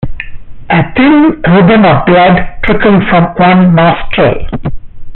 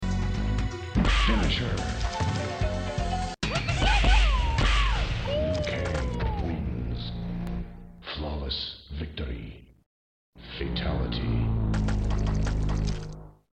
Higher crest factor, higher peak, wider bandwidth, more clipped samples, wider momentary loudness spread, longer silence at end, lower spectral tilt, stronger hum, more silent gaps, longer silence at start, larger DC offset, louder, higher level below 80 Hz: second, 8 dB vs 18 dB; first, 0 dBFS vs -10 dBFS; second, 4.3 kHz vs 9 kHz; neither; about the same, 14 LU vs 12 LU; second, 0 s vs 0.25 s; about the same, -5.5 dB/octave vs -5.5 dB/octave; neither; second, none vs 9.86-10.33 s; about the same, 0 s vs 0 s; neither; first, -7 LUFS vs -28 LUFS; first, -24 dBFS vs -30 dBFS